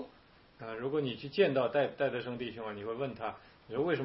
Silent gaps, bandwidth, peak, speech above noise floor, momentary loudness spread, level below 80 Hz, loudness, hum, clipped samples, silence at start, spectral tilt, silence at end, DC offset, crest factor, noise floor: none; 5.8 kHz; -14 dBFS; 27 dB; 14 LU; -70 dBFS; -34 LUFS; none; under 0.1%; 0 s; -9.5 dB/octave; 0 s; under 0.1%; 20 dB; -61 dBFS